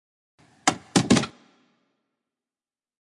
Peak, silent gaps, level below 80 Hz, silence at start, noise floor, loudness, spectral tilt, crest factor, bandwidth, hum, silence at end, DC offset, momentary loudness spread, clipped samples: -2 dBFS; none; -60 dBFS; 0.65 s; under -90 dBFS; -23 LUFS; -4 dB/octave; 26 dB; 11.5 kHz; none; 1.7 s; under 0.1%; 6 LU; under 0.1%